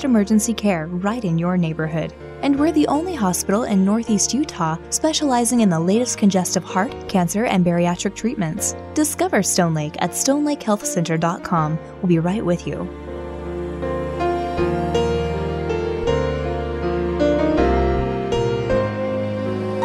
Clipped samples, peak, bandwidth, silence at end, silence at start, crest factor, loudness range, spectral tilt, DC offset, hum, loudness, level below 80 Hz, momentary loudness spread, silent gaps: under 0.1%; -4 dBFS; 15 kHz; 0 s; 0 s; 16 dB; 4 LU; -5 dB/octave; under 0.1%; none; -20 LUFS; -36 dBFS; 7 LU; none